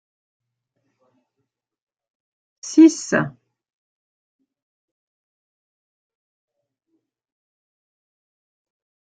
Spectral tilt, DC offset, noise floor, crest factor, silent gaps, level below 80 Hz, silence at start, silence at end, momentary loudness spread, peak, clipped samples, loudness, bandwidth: -5 dB/octave; under 0.1%; -78 dBFS; 24 dB; none; -74 dBFS; 2.65 s; 5.75 s; 18 LU; -2 dBFS; under 0.1%; -16 LUFS; 9 kHz